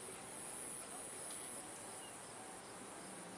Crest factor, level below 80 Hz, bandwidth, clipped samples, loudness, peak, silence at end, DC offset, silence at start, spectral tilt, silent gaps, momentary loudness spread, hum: 16 dB; -80 dBFS; 12 kHz; under 0.1%; -48 LUFS; -34 dBFS; 0 s; under 0.1%; 0 s; -2 dB/octave; none; 6 LU; none